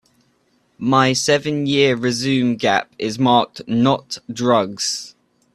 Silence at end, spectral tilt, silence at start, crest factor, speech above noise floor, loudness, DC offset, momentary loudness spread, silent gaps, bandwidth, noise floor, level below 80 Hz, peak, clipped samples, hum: 0.45 s; -4.5 dB/octave; 0.8 s; 18 dB; 44 dB; -18 LUFS; under 0.1%; 9 LU; none; 13 kHz; -62 dBFS; -58 dBFS; 0 dBFS; under 0.1%; none